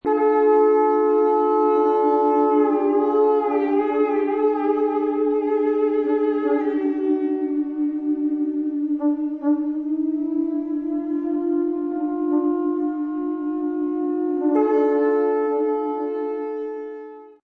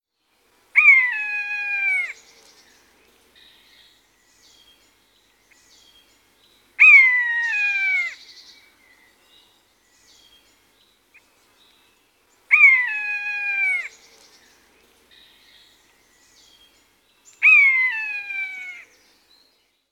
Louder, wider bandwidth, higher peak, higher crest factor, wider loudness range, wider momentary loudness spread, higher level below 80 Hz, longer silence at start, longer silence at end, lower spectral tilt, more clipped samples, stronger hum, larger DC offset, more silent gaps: second, -21 LUFS vs -15 LUFS; second, 4.1 kHz vs 15 kHz; second, -8 dBFS vs -2 dBFS; second, 12 dB vs 20 dB; second, 5 LU vs 12 LU; second, 7 LU vs 17 LU; first, -64 dBFS vs -74 dBFS; second, 0.05 s vs 0.75 s; second, 0.15 s vs 1.1 s; first, -7.5 dB/octave vs 1.5 dB/octave; neither; neither; neither; neither